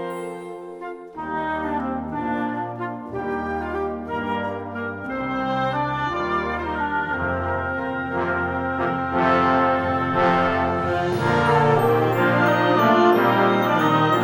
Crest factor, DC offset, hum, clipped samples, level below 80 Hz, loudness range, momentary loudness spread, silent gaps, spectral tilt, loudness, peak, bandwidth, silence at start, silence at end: 16 dB; under 0.1%; none; under 0.1%; -48 dBFS; 9 LU; 12 LU; none; -7 dB/octave; -21 LUFS; -4 dBFS; 18 kHz; 0 s; 0 s